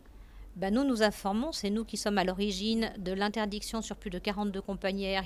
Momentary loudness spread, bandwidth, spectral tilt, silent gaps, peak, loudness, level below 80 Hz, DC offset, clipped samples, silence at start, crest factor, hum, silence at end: 7 LU; 15 kHz; -4.5 dB/octave; none; -12 dBFS; -32 LUFS; -50 dBFS; under 0.1%; under 0.1%; 0.05 s; 20 dB; none; 0 s